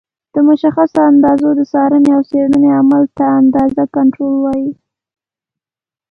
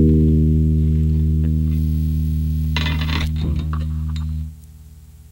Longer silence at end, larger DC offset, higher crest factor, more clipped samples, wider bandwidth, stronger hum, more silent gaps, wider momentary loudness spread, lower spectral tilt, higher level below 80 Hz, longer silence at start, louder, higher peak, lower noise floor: first, 1.4 s vs 0.1 s; neither; about the same, 12 dB vs 14 dB; neither; second, 5.4 kHz vs 16.5 kHz; second, none vs 60 Hz at -45 dBFS; neither; second, 6 LU vs 9 LU; about the same, -8.5 dB/octave vs -8 dB/octave; second, -50 dBFS vs -22 dBFS; first, 0.35 s vs 0 s; first, -11 LUFS vs -19 LUFS; first, 0 dBFS vs -4 dBFS; first, under -90 dBFS vs -41 dBFS